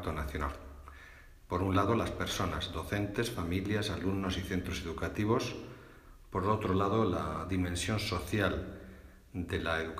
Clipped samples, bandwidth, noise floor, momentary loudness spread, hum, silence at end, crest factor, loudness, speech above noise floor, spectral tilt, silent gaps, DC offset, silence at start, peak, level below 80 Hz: under 0.1%; 15.5 kHz; -54 dBFS; 18 LU; none; 0 s; 18 dB; -34 LUFS; 21 dB; -5.5 dB/octave; none; under 0.1%; 0 s; -16 dBFS; -50 dBFS